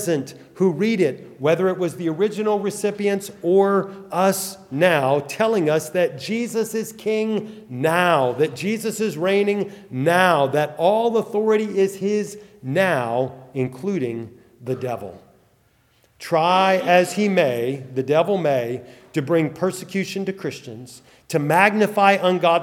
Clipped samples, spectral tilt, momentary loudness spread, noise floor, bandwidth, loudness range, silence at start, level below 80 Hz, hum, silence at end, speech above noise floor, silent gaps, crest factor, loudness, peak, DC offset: under 0.1%; -5.5 dB/octave; 12 LU; -60 dBFS; 17 kHz; 5 LU; 0 s; -68 dBFS; none; 0 s; 40 dB; none; 20 dB; -21 LUFS; 0 dBFS; under 0.1%